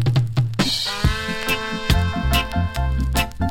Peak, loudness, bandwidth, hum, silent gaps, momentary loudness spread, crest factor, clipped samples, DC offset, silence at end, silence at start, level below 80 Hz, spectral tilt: -4 dBFS; -21 LUFS; 17 kHz; none; none; 3 LU; 18 dB; under 0.1%; under 0.1%; 0 s; 0 s; -26 dBFS; -5 dB/octave